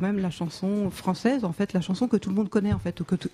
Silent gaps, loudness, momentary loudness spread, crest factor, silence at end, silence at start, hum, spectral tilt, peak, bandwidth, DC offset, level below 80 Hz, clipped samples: none; -27 LUFS; 4 LU; 16 dB; 0.05 s; 0 s; none; -7 dB/octave; -10 dBFS; 13.5 kHz; under 0.1%; -50 dBFS; under 0.1%